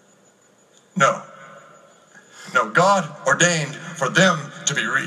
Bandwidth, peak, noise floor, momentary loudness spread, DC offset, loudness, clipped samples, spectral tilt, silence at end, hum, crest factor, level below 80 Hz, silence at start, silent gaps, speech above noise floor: 14 kHz; -2 dBFS; -56 dBFS; 13 LU; under 0.1%; -19 LUFS; under 0.1%; -3 dB/octave; 0 s; none; 20 dB; -72 dBFS; 0.95 s; none; 37 dB